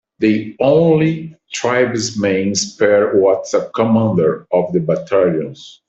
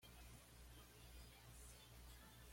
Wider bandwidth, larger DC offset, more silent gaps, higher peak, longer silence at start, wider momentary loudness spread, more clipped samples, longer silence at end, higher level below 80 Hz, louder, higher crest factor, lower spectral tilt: second, 8.2 kHz vs 16.5 kHz; neither; neither; first, -2 dBFS vs -50 dBFS; first, 0.2 s vs 0 s; first, 7 LU vs 2 LU; neither; first, 0.15 s vs 0 s; first, -56 dBFS vs -66 dBFS; first, -15 LUFS vs -62 LUFS; about the same, 12 dB vs 12 dB; first, -5.5 dB/octave vs -3.5 dB/octave